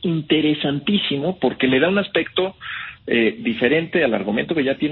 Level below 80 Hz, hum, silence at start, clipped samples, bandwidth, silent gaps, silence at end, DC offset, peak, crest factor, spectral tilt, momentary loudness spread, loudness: -54 dBFS; none; 0 s; under 0.1%; 4.4 kHz; none; 0 s; under 0.1%; -4 dBFS; 16 dB; -10 dB/octave; 5 LU; -20 LUFS